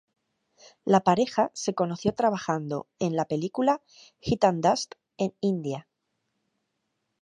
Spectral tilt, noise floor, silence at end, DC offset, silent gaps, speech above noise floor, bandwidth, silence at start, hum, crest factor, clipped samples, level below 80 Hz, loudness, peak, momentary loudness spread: -5.5 dB/octave; -79 dBFS; 1.4 s; under 0.1%; none; 53 dB; 11 kHz; 0.85 s; none; 22 dB; under 0.1%; -60 dBFS; -27 LUFS; -6 dBFS; 12 LU